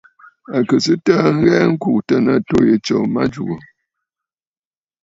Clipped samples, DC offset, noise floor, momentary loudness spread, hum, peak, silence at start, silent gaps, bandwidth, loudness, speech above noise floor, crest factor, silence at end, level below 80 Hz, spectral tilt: under 0.1%; under 0.1%; under -90 dBFS; 9 LU; none; 0 dBFS; 0.5 s; none; 7.8 kHz; -16 LUFS; over 75 dB; 16 dB; 1.4 s; -50 dBFS; -6.5 dB/octave